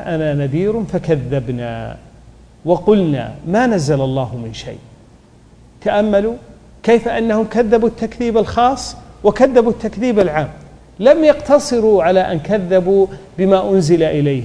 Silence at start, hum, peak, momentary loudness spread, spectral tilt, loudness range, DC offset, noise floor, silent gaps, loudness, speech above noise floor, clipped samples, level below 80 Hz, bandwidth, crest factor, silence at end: 0 s; none; 0 dBFS; 12 LU; -6.5 dB/octave; 5 LU; under 0.1%; -45 dBFS; none; -15 LUFS; 30 dB; under 0.1%; -40 dBFS; 11 kHz; 16 dB; 0 s